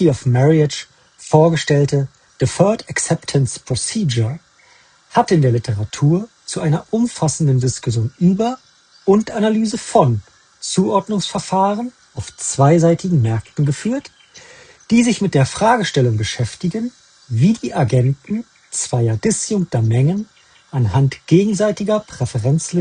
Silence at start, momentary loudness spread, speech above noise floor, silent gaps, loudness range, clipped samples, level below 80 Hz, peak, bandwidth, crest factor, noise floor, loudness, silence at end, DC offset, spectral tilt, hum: 0 s; 11 LU; 35 dB; none; 2 LU; under 0.1%; -50 dBFS; 0 dBFS; 10 kHz; 16 dB; -51 dBFS; -17 LUFS; 0 s; under 0.1%; -6 dB/octave; none